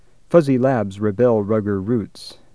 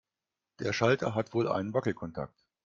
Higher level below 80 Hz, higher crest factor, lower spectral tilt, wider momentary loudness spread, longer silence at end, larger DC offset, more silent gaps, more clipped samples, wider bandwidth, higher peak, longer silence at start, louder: first, -56 dBFS vs -66 dBFS; about the same, 18 dB vs 22 dB; first, -8.5 dB/octave vs -6 dB/octave; second, 8 LU vs 12 LU; second, 0.2 s vs 0.4 s; first, 0.4% vs under 0.1%; neither; neither; first, 11 kHz vs 7.6 kHz; first, 0 dBFS vs -10 dBFS; second, 0.3 s vs 0.6 s; first, -19 LUFS vs -31 LUFS